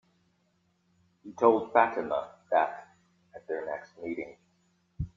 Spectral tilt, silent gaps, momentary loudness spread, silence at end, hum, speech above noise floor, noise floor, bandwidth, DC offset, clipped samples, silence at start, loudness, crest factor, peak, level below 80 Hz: -7.5 dB/octave; none; 20 LU; 0.1 s; none; 44 dB; -72 dBFS; 7.4 kHz; under 0.1%; under 0.1%; 1.25 s; -29 LUFS; 24 dB; -6 dBFS; -60 dBFS